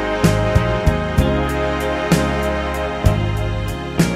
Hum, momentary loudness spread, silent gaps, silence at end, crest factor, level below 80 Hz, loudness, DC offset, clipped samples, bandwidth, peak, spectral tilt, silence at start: none; 5 LU; none; 0 s; 16 dB; -24 dBFS; -18 LUFS; under 0.1%; under 0.1%; 16 kHz; 0 dBFS; -6 dB/octave; 0 s